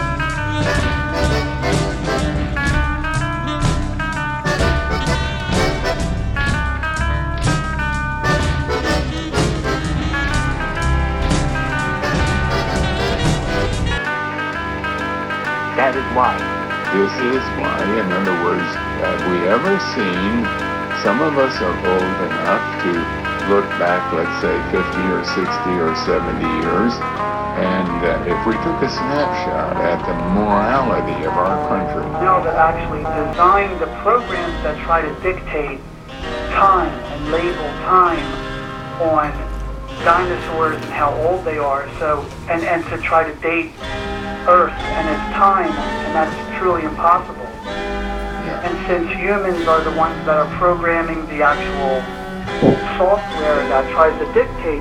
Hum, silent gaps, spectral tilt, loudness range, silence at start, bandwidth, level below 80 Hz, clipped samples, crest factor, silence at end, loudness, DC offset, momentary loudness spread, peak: none; none; -6 dB/octave; 2 LU; 0 s; 14 kHz; -28 dBFS; under 0.1%; 18 dB; 0 s; -18 LUFS; under 0.1%; 7 LU; 0 dBFS